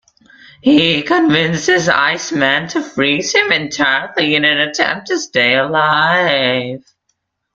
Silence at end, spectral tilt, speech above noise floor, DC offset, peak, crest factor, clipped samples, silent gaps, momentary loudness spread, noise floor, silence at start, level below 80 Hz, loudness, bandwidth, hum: 0.75 s; -3.5 dB/octave; 54 dB; under 0.1%; 0 dBFS; 14 dB; under 0.1%; none; 5 LU; -68 dBFS; 0.65 s; -54 dBFS; -13 LUFS; 7.8 kHz; none